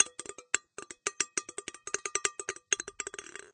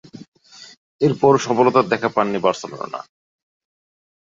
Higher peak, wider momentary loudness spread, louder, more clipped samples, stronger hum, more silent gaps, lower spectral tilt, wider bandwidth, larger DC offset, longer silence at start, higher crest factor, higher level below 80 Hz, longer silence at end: second, -6 dBFS vs -2 dBFS; second, 11 LU vs 15 LU; second, -34 LUFS vs -18 LUFS; neither; neither; second, none vs 0.28-0.32 s, 0.77-0.99 s; second, 1 dB/octave vs -6 dB/octave; first, 10 kHz vs 7.6 kHz; neither; second, 0 s vs 0.2 s; first, 30 dB vs 20 dB; second, -72 dBFS vs -62 dBFS; second, 0.05 s vs 1.3 s